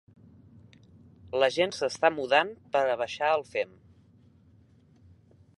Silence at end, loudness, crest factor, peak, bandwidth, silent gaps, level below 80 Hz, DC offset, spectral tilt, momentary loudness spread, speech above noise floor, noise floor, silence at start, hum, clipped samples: 1.9 s; -27 LUFS; 24 dB; -6 dBFS; 11.5 kHz; none; -66 dBFS; under 0.1%; -3.5 dB/octave; 8 LU; 32 dB; -59 dBFS; 1.25 s; none; under 0.1%